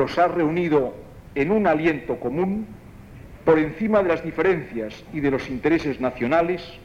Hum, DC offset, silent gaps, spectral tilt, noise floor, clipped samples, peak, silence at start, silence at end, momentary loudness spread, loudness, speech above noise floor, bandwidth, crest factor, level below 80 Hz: none; under 0.1%; none; -7.5 dB/octave; -42 dBFS; under 0.1%; -6 dBFS; 0 s; 0 s; 11 LU; -22 LUFS; 20 dB; 10 kHz; 16 dB; -48 dBFS